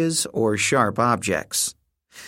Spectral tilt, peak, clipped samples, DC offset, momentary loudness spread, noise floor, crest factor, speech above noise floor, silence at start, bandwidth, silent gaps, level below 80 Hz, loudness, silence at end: -3.5 dB/octave; -4 dBFS; under 0.1%; under 0.1%; 4 LU; -47 dBFS; 20 dB; 25 dB; 0 s; 16.5 kHz; none; -58 dBFS; -21 LUFS; 0 s